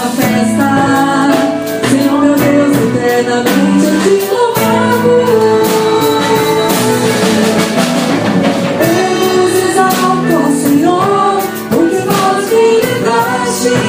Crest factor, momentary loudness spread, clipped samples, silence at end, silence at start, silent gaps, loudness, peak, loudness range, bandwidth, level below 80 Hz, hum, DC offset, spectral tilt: 10 dB; 3 LU; under 0.1%; 0 s; 0 s; none; -10 LUFS; 0 dBFS; 1 LU; 16 kHz; -46 dBFS; none; under 0.1%; -5 dB/octave